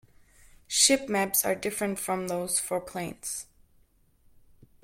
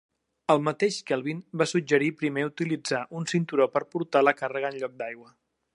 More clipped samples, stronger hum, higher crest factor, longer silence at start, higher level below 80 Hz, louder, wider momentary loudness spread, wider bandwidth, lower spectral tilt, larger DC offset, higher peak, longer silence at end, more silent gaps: neither; neither; about the same, 24 dB vs 22 dB; first, 0.7 s vs 0.5 s; first, -62 dBFS vs -78 dBFS; about the same, -27 LUFS vs -27 LUFS; first, 14 LU vs 11 LU; first, 16.5 kHz vs 11.5 kHz; second, -2 dB/octave vs -5 dB/octave; neither; about the same, -8 dBFS vs -6 dBFS; first, 1.4 s vs 0.5 s; neither